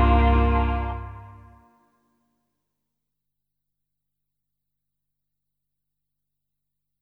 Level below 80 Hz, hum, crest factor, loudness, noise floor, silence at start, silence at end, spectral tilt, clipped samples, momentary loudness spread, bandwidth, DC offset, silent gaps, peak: -30 dBFS; 50 Hz at -65 dBFS; 20 dB; -22 LUFS; -84 dBFS; 0 s; 5.7 s; -9.5 dB/octave; under 0.1%; 21 LU; 4.2 kHz; under 0.1%; none; -8 dBFS